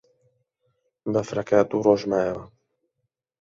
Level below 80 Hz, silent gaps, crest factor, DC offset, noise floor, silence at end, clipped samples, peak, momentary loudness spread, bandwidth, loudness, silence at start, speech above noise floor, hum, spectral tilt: -60 dBFS; none; 22 dB; under 0.1%; -80 dBFS; 0.95 s; under 0.1%; -4 dBFS; 11 LU; 7.6 kHz; -23 LUFS; 1.05 s; 57 dB; none; -6.5 dB/octave